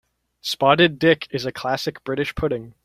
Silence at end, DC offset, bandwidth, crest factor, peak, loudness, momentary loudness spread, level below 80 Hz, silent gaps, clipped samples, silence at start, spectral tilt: 0.15 s; under 0.1%; 16 kHz; 20 dB; -2 dBFS; -21 LUFS; 11 LU; -46 dBFS; none; under 0.1%; 0.45 s; -5 dB/octave